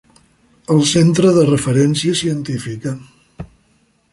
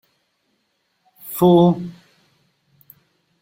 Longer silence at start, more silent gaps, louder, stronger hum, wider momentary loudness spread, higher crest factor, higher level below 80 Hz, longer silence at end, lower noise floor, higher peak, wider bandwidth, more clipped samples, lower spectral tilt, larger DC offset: second, 0.7 s vs 1.25 s; neither; about the same, -15 LUFS vs -16 LUFS; neither; about the same, 24 LU vs 23 LU; second, 14 dB vs 20 dB; first, -48 dBFS vs -60 dBFS; second, 0.65 s vs 1.5 s; second, -58 dBFS vs -69 dBFS; about the same, -2 dBFS vs -2 dBFS; second, 11.5 kHz vs 16.5 kHz; neither; second, -5.5 dB/octave vs -8 dB/octave; neither